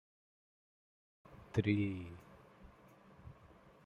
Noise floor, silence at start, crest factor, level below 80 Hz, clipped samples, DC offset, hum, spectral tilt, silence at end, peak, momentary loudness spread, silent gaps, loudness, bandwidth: -62 dBFS; 1.3 s; 26 dB; -68 dBFS; under 0.1%; under 0.1%; none; -8 dB/octave; 0.55 s; -18 dBFS; 26 LU; none; -38 LUFS; 8 kHz